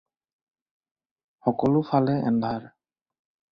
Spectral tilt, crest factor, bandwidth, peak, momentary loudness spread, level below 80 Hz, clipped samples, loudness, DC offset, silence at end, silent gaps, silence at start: -10 dB/octave; 20 dB; 5.8 kHz; -6 dBFS; 8 LU; -62 dBFS; under 0.1%; -24 LUFS; under 0.1%; 0.85 s; none; 1.45 s